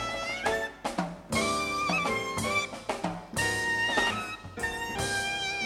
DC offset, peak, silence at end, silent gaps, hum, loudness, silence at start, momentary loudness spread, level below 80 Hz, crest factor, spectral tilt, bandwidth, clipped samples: under 0.1%; -12 dBFS; 0 s; none; none; -29 LUFS; 0 s; 7 LU; -52 dBFS; 18 dB; -3 dB/octave; 16.5 kHz; under 0.1%